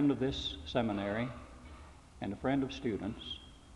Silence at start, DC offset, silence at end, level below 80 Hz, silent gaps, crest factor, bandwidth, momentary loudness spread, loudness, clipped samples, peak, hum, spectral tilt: 0 s; under 0.1%; 0 s; -54 dBFS; none; 20 dB; 11 kHz; 19 LU; -37 LUFS; under 0.1%; -16 dBFS; none; -6.5 dB/octave